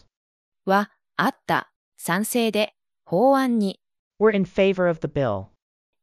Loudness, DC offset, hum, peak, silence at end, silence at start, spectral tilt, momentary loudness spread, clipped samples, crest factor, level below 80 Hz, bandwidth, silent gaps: -23 LUFS; under 0.1%; none; -6 dBFS; 0.55 s; 0.65 s; -5.5 dB/octave; 9 LU; under 0.1%; 18 dB; -58 dBFS; 15 kHz; 1.76-1.92 s, 3.99-4.11 s